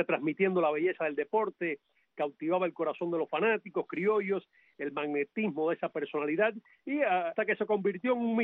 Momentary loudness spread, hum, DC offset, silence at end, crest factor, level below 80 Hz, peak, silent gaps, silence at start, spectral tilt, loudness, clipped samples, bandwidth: 7 LU; none; under 0.1%; 0 s; 16 dB; -82 dBFS; -14 dBFS; none; 0 s; -4.5 dB/octave; -31 LUFS; under 0.1%; 4 kHz